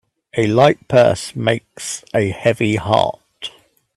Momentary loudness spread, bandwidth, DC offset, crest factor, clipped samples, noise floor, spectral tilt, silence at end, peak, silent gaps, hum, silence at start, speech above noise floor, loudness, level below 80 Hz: 16 LU; 13 kHz; under 0.1%; 18 dB; under 0.1%; -42 dBFS; -5.5 dB/octave; 0.5 s; 0 dBFS; none; none; 0.35 s; 26 dB; -17 LUFS; -52 dBFS